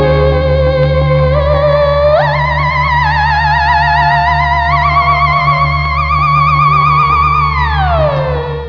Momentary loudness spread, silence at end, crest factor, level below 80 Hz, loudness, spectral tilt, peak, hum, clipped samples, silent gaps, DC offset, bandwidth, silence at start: 3 LU; 0 s; 10 dB; -20 dBFS; -10 LUFS; -7.5 dB/octave; 0 dBFS; none; under 0.1%; none; 0.7%; 5.4 kHz; 0 s